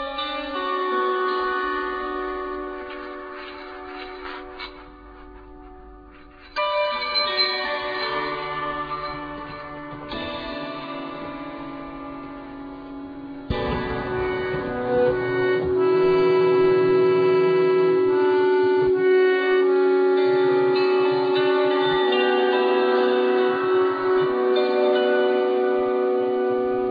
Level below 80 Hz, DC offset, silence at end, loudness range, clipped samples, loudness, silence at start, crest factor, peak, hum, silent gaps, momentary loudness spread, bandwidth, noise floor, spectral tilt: -48 dBFS; under 0.1%; 0 s; 14 LU; under 0.1%; -21 LUFS; 0 s; 12 dB; -10 dBFS; none; none; 17 LU; 5 kHz; -45 dBFS; -7.5 dB/octave